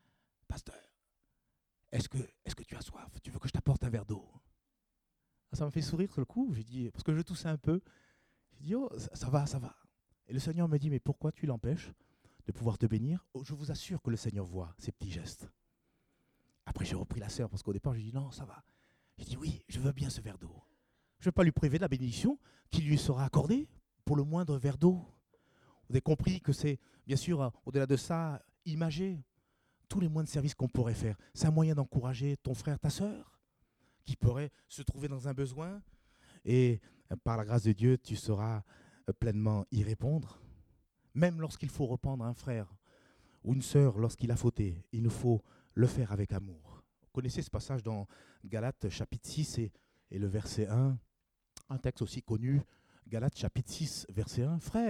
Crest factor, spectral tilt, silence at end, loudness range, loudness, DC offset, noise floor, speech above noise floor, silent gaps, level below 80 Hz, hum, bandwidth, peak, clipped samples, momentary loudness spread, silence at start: 22 dB; -7 dB/octave; 0 s; 7 LU; -35 LUFS; under 0.1%; -84 dBFS; 50 dB; none; -54 dBFS; none; 13.5 kHz; -14 dBFS; under 0.1%; 15 LU; 0.5 s